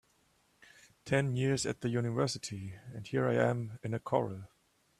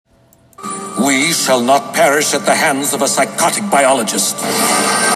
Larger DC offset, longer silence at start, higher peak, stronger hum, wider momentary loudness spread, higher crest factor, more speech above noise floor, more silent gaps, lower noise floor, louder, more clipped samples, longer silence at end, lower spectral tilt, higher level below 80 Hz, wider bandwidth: neither; first, 1.05 s vs 0.6 s; second, -14 dBFS vs 0 dBFS; neither; first, 14 LU vs 5 LU; first, 22 dB vs 14 dB; about the same, 38 dB vs 36 dB; neither; first, -71 dBFS vs -49 dBFS; second, -34 LUFS vs -13 LUFS; neither; first, 0.55 s vs 0 s; first, -5.5 dB/octave vs -2 dB/octave; second, -66 dBFS vs -60 dBFS; second, 13 kHz vs 15.5 kHz